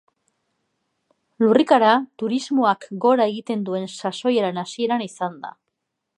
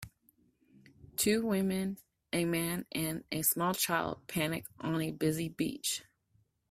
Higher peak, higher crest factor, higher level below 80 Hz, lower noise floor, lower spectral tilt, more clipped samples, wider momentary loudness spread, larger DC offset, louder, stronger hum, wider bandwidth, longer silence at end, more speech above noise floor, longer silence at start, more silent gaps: first, -2 dBFS vs -14 dBFS; about the same, 20 dB vs 20 dB; second, -76 dBFS vs -66 dBFS; first, -78 dBFS vs -73 dBFS; first, -5.5 dB/octave vs -4 dB/octave; neither; first, 13 LU vs 9 LU; neither; first, -21 LUFS vs -33 LUFS; neither; second, 11 kHz vs 16 kHz; about the same, 0.65 s vs 0.7 s; first, 58 dB vs 40 dB; first, 1.4 s vs 0 s; neither